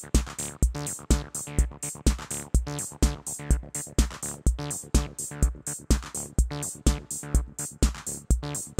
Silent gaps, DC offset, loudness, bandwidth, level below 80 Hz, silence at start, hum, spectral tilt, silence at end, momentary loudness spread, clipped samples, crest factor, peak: none; under 0.1%; -29 LUFS; 16.5 kHz; -28 dBFS; 0 s; none; -4.5 dB/octave; 0.05 s; 5 LU; under 0.1%; 20 dB; -8 dBFS